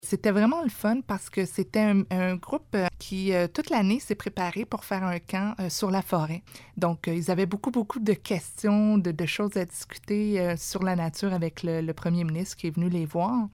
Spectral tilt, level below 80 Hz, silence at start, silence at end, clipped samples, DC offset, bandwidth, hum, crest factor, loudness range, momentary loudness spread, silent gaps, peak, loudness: -6 dB/octave; -56 dBFS; 0.05 s; 0.05 s; under 0.1%; under 0.1%; 17 kHz; none; 16 dB; 2 LU; 7 LU; none; -10 dBFS; -27 LUFS